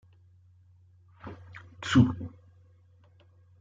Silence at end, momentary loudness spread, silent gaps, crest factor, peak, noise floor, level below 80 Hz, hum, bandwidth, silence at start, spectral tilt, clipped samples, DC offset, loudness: 1.3 s; 25 LU; none; 24 dB; -8 dBFS; -59 dBFS; -62 dBFS; none; 7.8 kHz; 1.25 s; -6.5 dB/octave; under 0.1%; under 0.1%; -26 LUFS